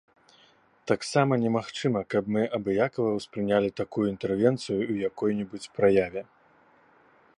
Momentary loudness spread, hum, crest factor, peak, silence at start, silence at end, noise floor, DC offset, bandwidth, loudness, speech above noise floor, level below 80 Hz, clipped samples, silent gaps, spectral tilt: 7 LU; none; 20 dB; -8 dBFS; 0.85 s; 1.15 s; -61 dBFS; under 0.1%; 11 kHz; -27 LUFS; 35 dB; -62 dBFS; under 0.1%; none; -6.5 dB/octave